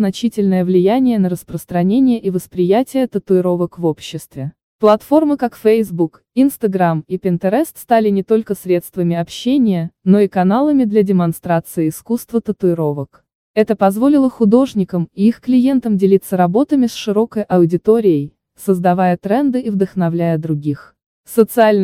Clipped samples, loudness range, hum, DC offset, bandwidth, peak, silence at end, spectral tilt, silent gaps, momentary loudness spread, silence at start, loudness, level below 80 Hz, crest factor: under 0.1%; 3 LU; none; under 0.1%; 16 kHz; 0 dBFS; 0 s; -7.5 dB/octave; 4.63-4.79 s, 13.35-13.54 s, 21.06-21.24 s; 7 LU; 0 s; -15 LUFS; -54 dBFS; 14 dB